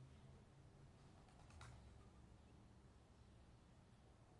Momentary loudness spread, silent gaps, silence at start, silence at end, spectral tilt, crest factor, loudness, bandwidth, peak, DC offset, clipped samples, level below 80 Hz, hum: 7 LU; none; 0 s; 0 s; -5.5 dB/octave; 18 dB; -67 LUFS; 11 kHz; -46 dBFS; under 0.1%; under 0.1%; -72 dBFS; none